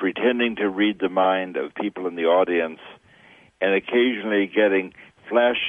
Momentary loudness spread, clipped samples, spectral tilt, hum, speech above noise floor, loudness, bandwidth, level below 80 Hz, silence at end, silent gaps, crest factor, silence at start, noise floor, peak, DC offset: 9 LU; under 0.1%; -7 dB/octave; none; 31 dB; -22 LUFS; 3.8 kHz; -66 dBFS; 0 s; none; 18 dB; 0 s; -52 dBFS; -6 dBFS; under 0.1%